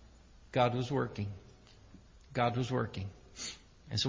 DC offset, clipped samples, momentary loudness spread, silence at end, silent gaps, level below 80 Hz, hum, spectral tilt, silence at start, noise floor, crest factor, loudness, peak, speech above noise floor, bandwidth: under 0.1%; under 0.1%; 13 LU; 0 s; none; -58 dBFS; none; -5.5 dB/octave; 0 s; -58 dBFS; 22 dB; -35 LUFS; -16 dBFS; 25 dB; 7.6 kHz